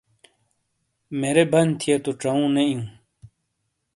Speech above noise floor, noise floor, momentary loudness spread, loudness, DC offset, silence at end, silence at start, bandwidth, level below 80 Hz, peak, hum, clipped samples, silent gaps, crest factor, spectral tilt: 55 dB; -76 dBFS; 13 LU; -21 LUFS; under 0.1%; 0.7 s; 1.1 s; 11.5 kHz; -64 dBFS; -4 dBFS; none; under 0.1%; none; 20 dB; -5.5 dB/octave